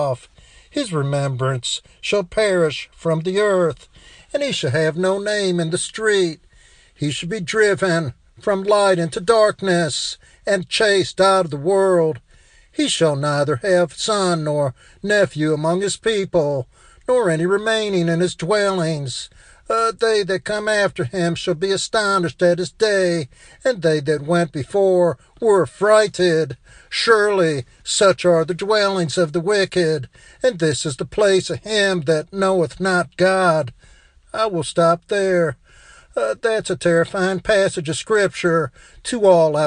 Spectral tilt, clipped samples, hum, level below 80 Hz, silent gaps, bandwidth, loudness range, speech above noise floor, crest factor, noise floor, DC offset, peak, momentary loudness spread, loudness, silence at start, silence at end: -4.5 dB/octave; under 0.1%; none; -52 dBFS; none; 10 kHz; 3 LU; 32 dB; 18 dB; -50 dBFS; under 0.1%; 0 dBFS; 9 LU; -19 LUFS; 0 s; 0 s